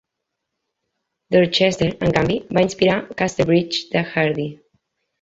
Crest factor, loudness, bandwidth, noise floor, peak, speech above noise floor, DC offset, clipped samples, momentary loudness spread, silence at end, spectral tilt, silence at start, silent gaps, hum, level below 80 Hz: 18 dB; -19 LUFS; 8 kHz; -80 dBFS; -2 dBFS; 61 dB; under 0.1%; under 0.1%; 5 LU; 0.65 s; -5.5 dB/octave; 1.3 s; none; none; -48 dBFS